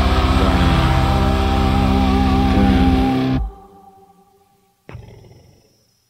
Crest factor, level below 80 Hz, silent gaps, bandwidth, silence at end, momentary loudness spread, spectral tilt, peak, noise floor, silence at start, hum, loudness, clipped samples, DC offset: 14 dB; -22 dBFS; none; 15.5 kHz; 1.1 s; 4 LU; -7 dB/octave; -2 dBFS; -58 dBFS; 0 s; none; -16 LUFS; under 0.1%; under 0.1%